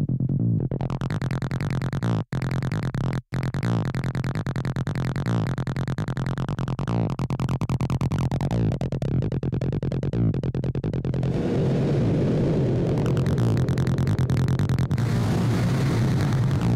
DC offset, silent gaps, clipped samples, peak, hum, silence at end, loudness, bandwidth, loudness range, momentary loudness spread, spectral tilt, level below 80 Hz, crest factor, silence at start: under 0.1%; none; under 0.1%; -14 dBFS; none; 0 s; -25 LUFS; 12 kHz; 4 LU; 5 LU; -8 dB/octave; -40 dBFS; 8 dB; 0 s